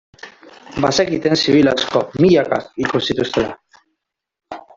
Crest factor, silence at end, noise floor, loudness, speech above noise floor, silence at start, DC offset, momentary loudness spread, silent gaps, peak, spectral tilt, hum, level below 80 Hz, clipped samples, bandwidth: 16 dB; 0.15 s; -76 dBFS; -16 LUFS; 60 dB; 0.25 s; under 0.1%; 11 LU; none; -2 dBFS; -5 dB/octave; none; -50 dBFS; under 0.1%; 7.8 kHz